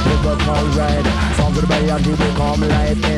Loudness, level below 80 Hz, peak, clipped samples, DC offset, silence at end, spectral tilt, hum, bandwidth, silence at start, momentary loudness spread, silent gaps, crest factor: -16 LUFS; -22 dBFS; -4 dBFS; under 0.1%; under 0.1%; 0 s; -6 dB/octave; none; 12 kHz; 0 s; 1 LU; none; 12 dB